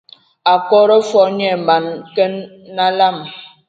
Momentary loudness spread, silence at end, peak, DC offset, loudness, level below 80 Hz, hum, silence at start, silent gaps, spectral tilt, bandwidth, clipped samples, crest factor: 16 LU; 0.25 s; 0 dBFS; under 0.1%; -14 LUFS; -68 dBFS; none; 0.45 s; none; -5 dB/octave; 7.8 kHz; under 0.1%; 14 dB